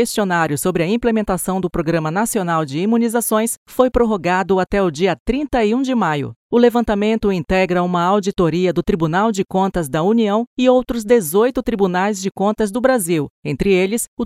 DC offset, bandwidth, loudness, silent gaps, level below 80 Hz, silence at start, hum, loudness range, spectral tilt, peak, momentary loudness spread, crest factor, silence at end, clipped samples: under 0.1%; 16 kHz; -17 LUFS; 3.57-3.66 s, 5.20-5.26 s, 6.36-6.50 s, 10.47-10.57 s, 13.30-13.43 s, 14.08-14.17 s; -38 dBFS; 0 s; none; 1 LU; -5.5 dB/octave; 0 dBFS; 5 LU; 16 dB; 0 s; under 0.1%